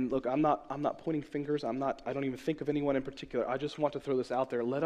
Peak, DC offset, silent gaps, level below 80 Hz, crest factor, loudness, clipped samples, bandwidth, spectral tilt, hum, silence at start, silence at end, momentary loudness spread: -16 dBFS; under 0.1%; none; -62 dBFS; 18 dB; -33 LUFS; under 0.1%; 10.5 kHz; -7.5 dB/octave; none; 0 s; 0 s; 6 LU